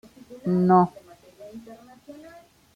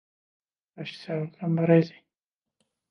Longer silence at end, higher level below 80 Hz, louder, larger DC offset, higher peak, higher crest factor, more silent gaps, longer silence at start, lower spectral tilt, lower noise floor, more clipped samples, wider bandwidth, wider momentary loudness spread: second, 0.65 s vs 1 s; first, -64 dBFS vs -80 dBFS; first, -22 LUFS vs -25 LUFS; neither; about the same, -8 dBFS vs -8 dBFS; about the same, 18 dB vs 22 dB; neither; second, 0.3 s vs 0.8 s; about the same, -9.5 dB/octave vs -9 dB/octave; second, -50 dBFS vs under -90 dBFS; neither; first, 7 kHz vs 6.2 kHz; first, 26 LU vs 18 LU